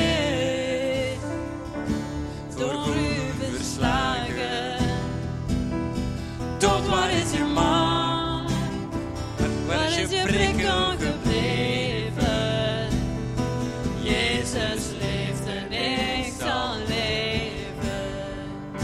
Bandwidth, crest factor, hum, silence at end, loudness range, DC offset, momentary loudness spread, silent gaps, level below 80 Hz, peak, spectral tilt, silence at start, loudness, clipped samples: 14.5 kHz; 20 dB; none; 0 s; 3 LU; under 0.1%; 9 LU; none; -38 dBFS; -6 dBFS; -4.5 dB/octave; 0 s; -25 LUFS; under 0.1%